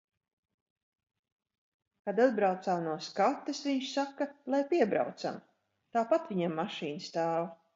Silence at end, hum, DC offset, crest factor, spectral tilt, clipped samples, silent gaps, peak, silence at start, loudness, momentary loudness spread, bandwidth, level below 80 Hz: 0.2 s; none; under 0.1%; 20 dB; -5.5 dB/octave; under 0.1%; none; -14 dBFS; 2.05 s; -32 LUFS; 9 LU; 7.8 kHz; -84 dBFS